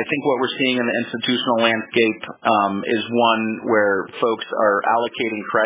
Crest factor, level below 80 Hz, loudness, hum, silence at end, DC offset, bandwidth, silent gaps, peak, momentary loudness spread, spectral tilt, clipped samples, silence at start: 20 dB; -66 dBFS; -19 LUFS; none; 0 s; under 0.1%; 4 kHz; none; 0 dBFS; 5 LU; -8.5 dB/octave; under 0.1%; 0 s